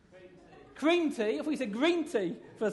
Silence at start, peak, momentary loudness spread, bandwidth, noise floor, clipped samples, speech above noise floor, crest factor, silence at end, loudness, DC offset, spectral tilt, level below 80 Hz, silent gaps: 0.15 s; -16 dBFS; 6 LU; 11.5 kHz; -55 dBFS; under 0.1%; 25 dB; 16 dB; 0 s; -31 LUFS; under 0.1%; -5 dB/octave; -72 dBFS; none